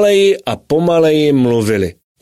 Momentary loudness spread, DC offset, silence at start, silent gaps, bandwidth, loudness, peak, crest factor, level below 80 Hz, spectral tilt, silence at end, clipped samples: 7 LU; 0.2%; 0 s; none; 14.5 kHz; -13 LUFS; -2 dBFS; 10 dB; -46 dBFS; -6 dB/octave; 0.3 s; under 0.1%